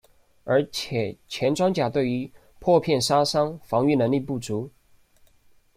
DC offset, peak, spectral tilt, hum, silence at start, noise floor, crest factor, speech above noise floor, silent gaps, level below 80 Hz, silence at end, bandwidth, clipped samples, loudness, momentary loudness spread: under 0.1%; -6 dBFS; -5.5 dB/octave; none; 0.45 s; -58 dBFS; 18 dB; 35 dB; none; -58 dBFS; 1.1 s; 16 kHz; under 0.1%; -24 LUFS; 11 LU